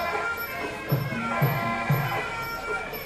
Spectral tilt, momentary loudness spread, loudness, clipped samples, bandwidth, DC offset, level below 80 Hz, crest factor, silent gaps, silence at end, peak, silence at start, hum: -6 dB/octave; 6 LU; -27 LUFS; under 0.1%; 14 kHz; under 0.1%; -50 dBFS; 16 dB; none; 0 s; -12 dBFS; 0 s; none